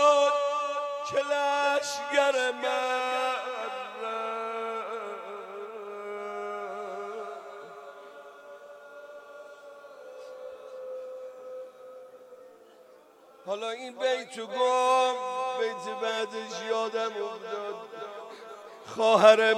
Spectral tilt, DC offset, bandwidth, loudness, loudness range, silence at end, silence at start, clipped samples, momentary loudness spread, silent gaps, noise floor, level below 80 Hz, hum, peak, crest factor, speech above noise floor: -2 dB/octave; under 0.1%; 14 kHz; -29 LUFS; 16 LU; 0 s; 0 s; under 0.1%; 22 LU; none; -55 dBFS; -86 dBFS; none; -6 dBFS; 24 dB; 29 dB